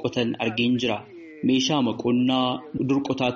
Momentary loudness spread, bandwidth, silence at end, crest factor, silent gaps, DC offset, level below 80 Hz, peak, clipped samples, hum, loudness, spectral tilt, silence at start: 7 LU; 7.4 kHz; 0 s; 14 dB; none; under 0.1%; -60 dBFS; -10 dBFS; under 0.1%; none; -24 LUFS; -4 dB/octave; 0 s